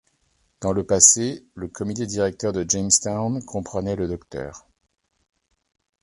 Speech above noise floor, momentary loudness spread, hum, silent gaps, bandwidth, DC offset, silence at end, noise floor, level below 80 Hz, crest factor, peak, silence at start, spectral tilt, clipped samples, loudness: 44 dB; 20 LU; none; none; 12.5 kHz; under 0.1%; 1.45 s; -67 dBFS; -48 dBFS; 24 dB; 0 dBFS; 0.6 s; -3.5 dB/octave; under 0.1%; -20 LUFS